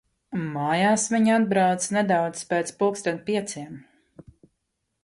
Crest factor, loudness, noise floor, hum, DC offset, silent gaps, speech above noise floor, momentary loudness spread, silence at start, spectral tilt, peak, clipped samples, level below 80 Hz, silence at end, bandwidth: 16 dB; -24 LUFS; -78 dBFS; none; under 0.1%; none; 55 dB; 12 LU; 0.3 s; -4.5 dB/octave; -10 dBFS; under 0.1%; -66 dBFS; 1.2 s; 11.5 kHz